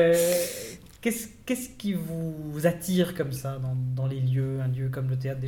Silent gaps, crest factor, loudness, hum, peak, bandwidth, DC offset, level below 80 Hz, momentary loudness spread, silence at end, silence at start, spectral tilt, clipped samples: none; 18 dB; -28 LUFS; none; -10 dBFS; 18.5 kHz; under 0.1%; -56 dBFS; 8 LU; 0 s; 0 s; -6 dB/octave; under 0.1%